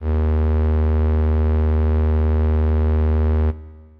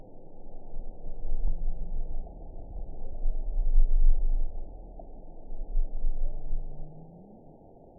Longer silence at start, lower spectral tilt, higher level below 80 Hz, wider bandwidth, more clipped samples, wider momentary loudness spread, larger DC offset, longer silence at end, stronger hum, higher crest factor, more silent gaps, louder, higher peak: about the same, 0 s vs 0.1 s; second, -11 dB/octave vs -15 dB/octave; first, -20 dBFS vs -28 dBFS; first, 3.5 kHz vs 0.9 kHz; neither; second, 1 LU vs 21 LU; neither; second, 0.2 s vs 0.75 s; neither; second, 4 dB vs 16 dB; neither; first, -19 LUFS vs -37 LUFS; second, -14 dBFS vs -10 dBFS